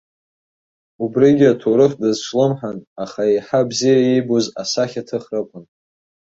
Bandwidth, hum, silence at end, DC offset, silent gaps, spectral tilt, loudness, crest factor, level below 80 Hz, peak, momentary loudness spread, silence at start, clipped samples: 8 kHz; none; 0.75 s; under 0.1%; 2.87-2.96 s; -5.5 dB/octave; -17 LUFS; 16 dB; -62 dBFS; -2 dBFS; 13 LU; 1 s; under 0.1%